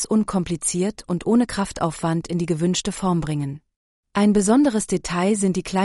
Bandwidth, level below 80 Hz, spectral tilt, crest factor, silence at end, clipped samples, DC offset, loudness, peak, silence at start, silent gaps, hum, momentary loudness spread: 11.5 kHz; -46 dBFS; -5.5 dB/octave; 16 dB; 0 s; under 0.1%; under 0.1%; -21 LUFS; -6 dBFS; 0 s; 3.76-4.03 s; none; 8 LU